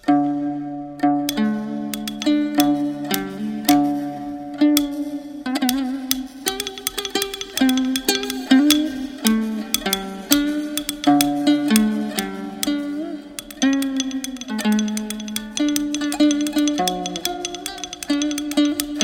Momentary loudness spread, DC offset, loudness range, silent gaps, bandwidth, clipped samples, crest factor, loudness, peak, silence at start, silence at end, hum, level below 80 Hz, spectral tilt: 10 LU; under 0.1%; 3 LU; none; over 20 kHz; under 0.1%; 20 dB; -21 LUFS; 0 dBFS; 0.05 s; 0 s; none; -52 dBFS; -3 dB/octave